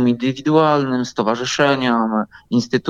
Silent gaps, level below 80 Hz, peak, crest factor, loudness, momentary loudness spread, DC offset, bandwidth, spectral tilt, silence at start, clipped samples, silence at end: none; -58 dBFS; -2 dBFS; 14 dB; -18 LUFS; 6 LU; under 0.1%; 7.8 kHz; -5.5 dB/octave; 0 s; under 0.1%; 0 s